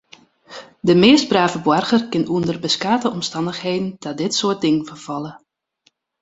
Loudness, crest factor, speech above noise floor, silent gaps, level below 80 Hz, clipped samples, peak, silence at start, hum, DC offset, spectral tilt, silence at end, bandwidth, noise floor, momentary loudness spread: -18 LUFS; 18 dB; 45 dB; none; -58 dBFS; under 0.1%; 0 dBFS; 0.5 s; none; under 0.1%; -4.5 dB/octave; 0.85 s; 8.2 kHz; -63 dBFS; 16 LU